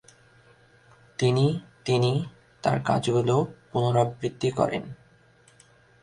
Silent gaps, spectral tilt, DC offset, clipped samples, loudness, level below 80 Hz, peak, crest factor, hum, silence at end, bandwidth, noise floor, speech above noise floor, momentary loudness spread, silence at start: none; -6.5 dB/octave; under 0.1%; under 0.1%; -26 LUFS; -58 dBFS; -6 dBFS; 20 dB; none; 1.1 s; 11 kHz; -58 dBFS; 34 dB; 10 LU; 1.2 s